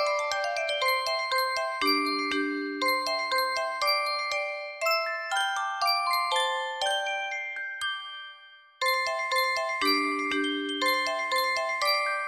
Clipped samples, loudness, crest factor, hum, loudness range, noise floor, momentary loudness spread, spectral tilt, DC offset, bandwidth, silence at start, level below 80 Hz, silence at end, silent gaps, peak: under 0.1%; -27 LUFS; 16 dB; none; 3 LU; -52 dBFS; 6 LU; 0 dB/octave; under 0.1%; 16 kHz; 0 s; -72 dBFS; 0 s; none; -12 dBFS